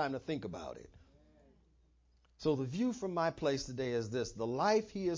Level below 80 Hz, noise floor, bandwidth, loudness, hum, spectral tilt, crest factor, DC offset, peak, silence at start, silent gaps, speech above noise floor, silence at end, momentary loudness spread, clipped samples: -62 dBFS; -70 dBFS; 7.6 kHz; -36 LUFS; none; -5.5 dB/octave; 18 dB; under 0.1%; -18 dBFS; 0 s; none; 34 dB; 0 s; 11 LU; under 0.1%